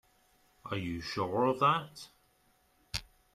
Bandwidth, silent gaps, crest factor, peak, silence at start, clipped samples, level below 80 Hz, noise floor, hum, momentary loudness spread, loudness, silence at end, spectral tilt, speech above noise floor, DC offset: 15 kHz; none; 20 dB; -14 dBFS; 0.65 s; under 0.1%; -60 dBFS; -70 dBFS; none; 22 LU; -33 LUFS; 0.3 s; -5.5 dB/octave; 38 dB; under 0.1%